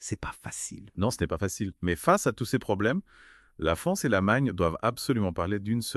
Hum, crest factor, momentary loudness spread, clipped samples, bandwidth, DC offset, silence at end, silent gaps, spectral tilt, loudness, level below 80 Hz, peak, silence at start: none; 20 dB; 11 LU; under 0.1%; 13.5 kHz; under 0.1%; 0 s; none; -5.5 dB/octave; -28 LUFS; -48 dBFS; -8 dBFS; 0 s